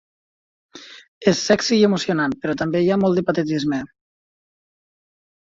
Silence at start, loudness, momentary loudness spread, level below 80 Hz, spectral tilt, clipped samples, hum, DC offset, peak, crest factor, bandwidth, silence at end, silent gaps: 0.75 s; -19 LUFS; 11 LU; -58 dBFS; -5 dB/octave; under 0.1%; none; under 0.1%; -2 dBFS; 20 dB; 7.8 kHz; 1.55 s; 1.08-1.21 s